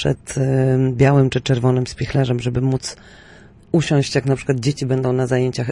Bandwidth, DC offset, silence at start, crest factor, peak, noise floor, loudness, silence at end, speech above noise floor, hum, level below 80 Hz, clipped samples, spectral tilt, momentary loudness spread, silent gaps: 11 kHz; under 0.1%; 0 s; 14 dB; -4 dBFS; -42 dBFS; -18 LUFS; 0 s; 24 dB; none; -44 dBFS; under 0.1%; -6.5 dB/octave; 6 LU; none